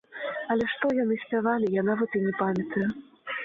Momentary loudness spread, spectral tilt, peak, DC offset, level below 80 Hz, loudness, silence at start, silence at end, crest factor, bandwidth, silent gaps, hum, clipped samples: 8 LU; -8 dB/octave; -12 dBFS; under 0.1%; -64 dBFS; -27 LUFS; 0.1 s; 0 s; 16 dB; 7.2 kHz; none; none; under 0.1%